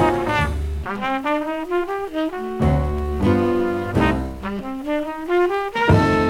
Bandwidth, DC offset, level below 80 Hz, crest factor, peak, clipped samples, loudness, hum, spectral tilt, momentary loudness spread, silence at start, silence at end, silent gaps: 16 kHz; under 0.1%; -30 dBFS; 18 dB; -2 dBFS; under 0.1%; -21 LUFS; none; -7.5 dB/octave; 8 LU; 0 s; 0 s; none